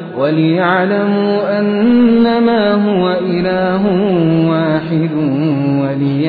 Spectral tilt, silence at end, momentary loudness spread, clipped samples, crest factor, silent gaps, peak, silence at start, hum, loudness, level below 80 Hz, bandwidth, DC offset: -10.5 dB/octave; 0 s; 5 LU; under 0.1%; 10 dB; none; -2 dBFS; 0 s; none; -13 LUFS; -48 dBFS; 4.9 kHz; under 0.1%